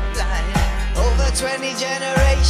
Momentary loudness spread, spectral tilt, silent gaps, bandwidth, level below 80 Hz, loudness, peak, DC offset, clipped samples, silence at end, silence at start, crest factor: 4 LU; -4 dB/octave; none; 15 kHz; -20 dBFS; -20 LUFS; -4 dBFS; under 0.1%; under 0.1%; 0 s; 0 s; 14 dB